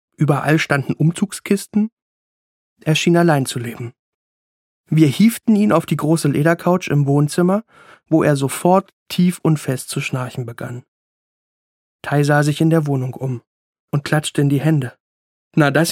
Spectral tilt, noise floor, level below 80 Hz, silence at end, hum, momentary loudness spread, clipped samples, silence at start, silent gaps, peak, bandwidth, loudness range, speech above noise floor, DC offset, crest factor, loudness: -6 dB/octave; under -90 dBFS; -62 dBFS; 0 s; none; 12 LU; under 0.1%; 0.2 s; 1.92-2.76 s, 3.99-4.84 s, 8.93-9.06 s, 10.88-11.99 s, 13.47-13.73 s, 13.79-13.88 s, 15.00-15.51 s; 0 dBFS; 16.5 kHz; 4 LU; over 73 dB; under 0.1%; 18 dB; -17 LUFS